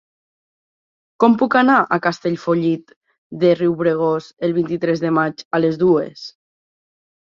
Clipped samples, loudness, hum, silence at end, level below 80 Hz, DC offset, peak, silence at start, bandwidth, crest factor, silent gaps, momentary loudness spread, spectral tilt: under 0.1%; -17 LUFS; none; 0.95 s; -62 dBFS; under 0.1%; -2 dBFS; 1.2 s; 7.4 kHz; 18 dB; 2.96-3.01 s, 3.18-3.30 s, 5.45-5.51 s; 9 LU; -7.5 dB/octave